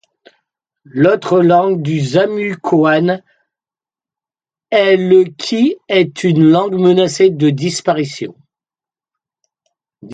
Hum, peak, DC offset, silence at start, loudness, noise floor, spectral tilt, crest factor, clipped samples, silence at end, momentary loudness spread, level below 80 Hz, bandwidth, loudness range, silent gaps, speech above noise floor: none; 0 dBFS; under 0.1%; 0.95 s; -13 LUFS; under -90 dBFS; -6 dB/octave; 14 dB; under 0.1%; 0 s; 8 LU; -60 dBFS; 9.4 kHz; 4 LU; none; over 78 dB